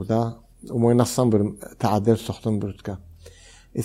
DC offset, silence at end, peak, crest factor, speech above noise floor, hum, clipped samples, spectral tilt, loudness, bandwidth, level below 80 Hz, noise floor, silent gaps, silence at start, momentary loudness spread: under 0.1%; 0 s; -4 dBFS; 18 dB; 26 dB; none; under 0.1%; -7 dB/octave; -23 LUFS; 16 kHz; -52 dBFS; -48 dBFS; none; 0 s; 16 LU